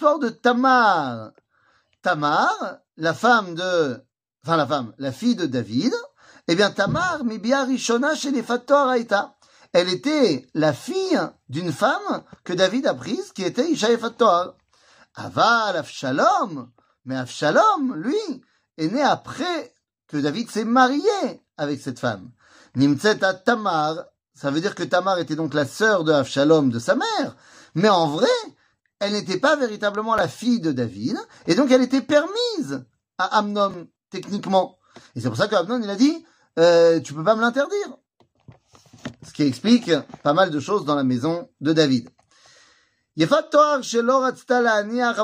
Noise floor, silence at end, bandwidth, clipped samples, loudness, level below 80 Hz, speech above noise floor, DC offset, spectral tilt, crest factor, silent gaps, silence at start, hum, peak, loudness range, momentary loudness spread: -63 dBFS; 0 s; 15.5 kHz; under 0.1%; -21 LUFS; -64 dBFS; 42 dB; under 0.1%; -5 dB/octave; 20 dB; none; 0 s; none; -2 dBFS; 3 LU; 13 LU